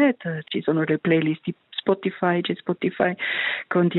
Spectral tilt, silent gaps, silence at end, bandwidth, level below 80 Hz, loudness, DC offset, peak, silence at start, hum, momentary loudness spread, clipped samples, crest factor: -10 dB/octave; none; 0 s; 4.2 kHz; -68 dBFS; -24 LUFS; under 0.1%; -8 dBFS; 0 s; none; 7 LU; under 0.1%; 16 dB